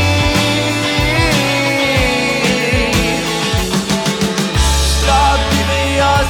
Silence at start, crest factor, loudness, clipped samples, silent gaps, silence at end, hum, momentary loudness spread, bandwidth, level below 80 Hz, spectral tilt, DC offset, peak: 0 s; 12 dB; -13 LUFS; under 0.1%; none; 0 s; none; 3 LU; 19.5 kHz; -22 dBFS; -4 dB/octave; under 0.1%; 0 dBFS